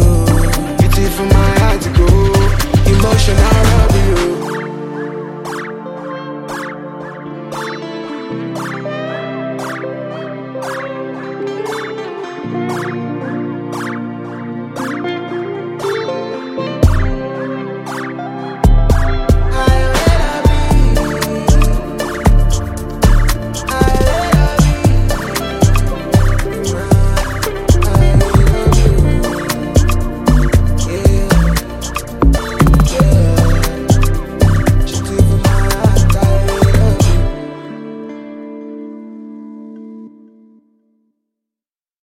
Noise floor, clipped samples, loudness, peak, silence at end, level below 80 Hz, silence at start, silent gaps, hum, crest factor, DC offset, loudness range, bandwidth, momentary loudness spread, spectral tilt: under -90 dBFS; under 0.1%; -15 LUFS; 0 dBFS; 1.95 s; -16 dBFS; 0 s; none; none; 12 dB; under 0.1%; 11 LU; 16 kHz; 14 LU; -6 dB/octave